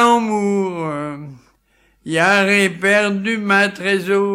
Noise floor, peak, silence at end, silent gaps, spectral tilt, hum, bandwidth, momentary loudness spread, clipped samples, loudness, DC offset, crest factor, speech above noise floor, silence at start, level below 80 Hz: -58 dBFS; -2 dBFS; 0 s; none; -4.5 dB/octave; none; 15.5 kHz; 12 LU; under 0.1%; -16 LUFS; under 0.1%; 16 dB; 43 dB; 0 s; -60 dBFS